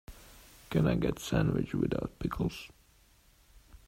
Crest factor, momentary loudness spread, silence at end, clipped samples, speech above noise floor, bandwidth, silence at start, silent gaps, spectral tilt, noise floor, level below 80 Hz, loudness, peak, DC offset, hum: 18 dB; 22 LU; 0.1 s; under 0.1%; 32 dB; 16 kHz; 0.1 s; none; -7 dB/octave; -63 dBFS; -48 dBFS; -32 LUFS; -14 dBFS; under 0.1%; none